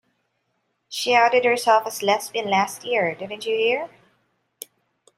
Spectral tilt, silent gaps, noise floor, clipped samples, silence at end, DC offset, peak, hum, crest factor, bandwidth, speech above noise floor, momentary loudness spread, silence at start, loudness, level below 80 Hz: -2.5 dB/octave; none; -73 dBFS; under 0.1%; 1.3 s; under 0.1%; -4 dBFS; none; 20 dB; 16 kHz; 52 dB; 21 LU; 0.9 s; -21 LUFS; -76 dBFS